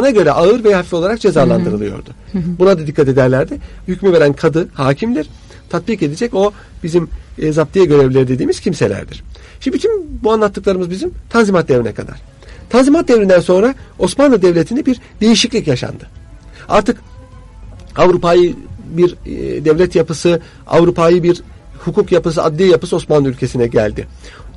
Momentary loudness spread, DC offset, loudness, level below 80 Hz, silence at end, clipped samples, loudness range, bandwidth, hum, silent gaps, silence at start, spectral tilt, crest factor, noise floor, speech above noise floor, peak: 13 LU; under 0.1%; -13 LUFS; -36 dBFS; 0.05 s; under 0.1%; 4 LU; 11.5 kHz; none; none; 0 s; -6 dB/octave; 12 dB; -35 dBFS; 22 dB; 0 dBFS